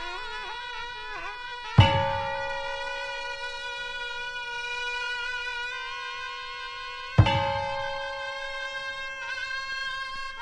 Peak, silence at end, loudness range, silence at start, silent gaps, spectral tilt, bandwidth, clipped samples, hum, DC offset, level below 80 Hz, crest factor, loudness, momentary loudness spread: -4 dBFS; 0 s; 4 LU; 0 s; none; -5 dB/octave; 10.5 kHz; under 0.1%; none; under 0.1%; -46 dBFS; 26 dB; -29 LUFS; 13 LU